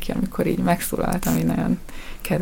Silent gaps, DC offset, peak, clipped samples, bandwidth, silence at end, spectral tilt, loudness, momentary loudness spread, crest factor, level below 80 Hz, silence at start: none; under 0.1%; -6 dBFS; under 0.1%; 17 kHz; 0 s; -6 dB/octave; -23 LUFS; 6 LU; 16 dB; -34 dBFS; 0 s